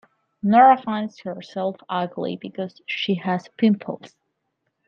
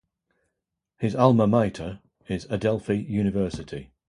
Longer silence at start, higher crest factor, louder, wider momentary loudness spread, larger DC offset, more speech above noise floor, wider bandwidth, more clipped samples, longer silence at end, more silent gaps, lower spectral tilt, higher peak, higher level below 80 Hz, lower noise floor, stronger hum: second, 0.45 s vs 1 s; about the same, 20 dB vs 22 dB; about the same, -22 LUFS vs -24 LUFS; about the same, 17 LU vs 17 LU; neither; second, 54 dB vs 59 dB; second, 6.8 kHz vs 11 kHz; neither; first, 0.8 s vs 0.25 s; neither; about the same, -7.5 dB/octave vs -8 dB/octave; about the same, -2 dBFS vs -4 dBFS; second, -72 dBFS vs -50 dBFS; second, -75 dBFS vs -83 dBFS; neither